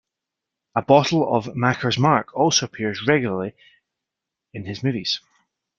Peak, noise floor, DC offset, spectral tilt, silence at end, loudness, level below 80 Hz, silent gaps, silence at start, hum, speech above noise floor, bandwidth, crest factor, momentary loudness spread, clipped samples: -2 dBFS; -85 dBFS; under 0.1%; -4.5 dB/octave; 0.6 s; -21 LUFS; -60 dBFS; none; 0.75 s; none; 64 dB; 7.4 kHz; 20 dB; 12 LU; under 0.1%